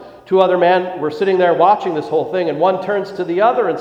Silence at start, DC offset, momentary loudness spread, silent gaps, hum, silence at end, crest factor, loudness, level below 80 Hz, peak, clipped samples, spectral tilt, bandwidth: 0 s; under 0.1%; 8 LU; none; none; 0 s; 16 dB; -15 LUFS; -62 dBFS; 0 dBFS; under 0.1%; -7 dB/octave; 7.6 kHz